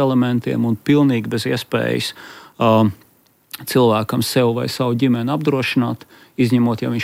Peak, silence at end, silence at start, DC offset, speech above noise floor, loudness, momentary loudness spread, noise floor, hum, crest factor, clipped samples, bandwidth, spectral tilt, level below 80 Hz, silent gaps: -4 dBFS; 0 s; 0 s; under 0.1%; 31 dB; -18 LUFS; 10 LU; -48 dBFS; none; 14 dB; under 0.1%; 16 kHz; -6 dB/octave; -60 dBFS; none